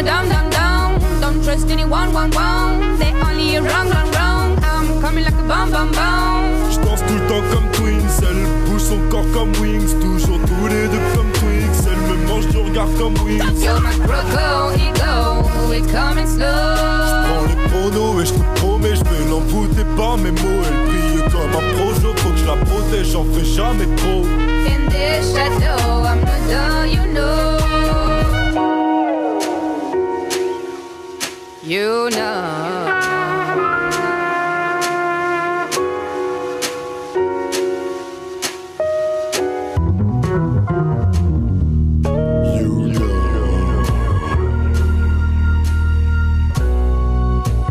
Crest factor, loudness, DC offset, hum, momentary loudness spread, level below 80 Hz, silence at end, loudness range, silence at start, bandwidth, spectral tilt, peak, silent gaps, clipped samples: 12 dB; -17 LUFS; under 0.1%; none; 4 LU; -18 dBFS; 0 s; 4 LU; 0 s; 15.5 kHz; -5.5 dB/octave; -4 dBFS; none; under 0.1%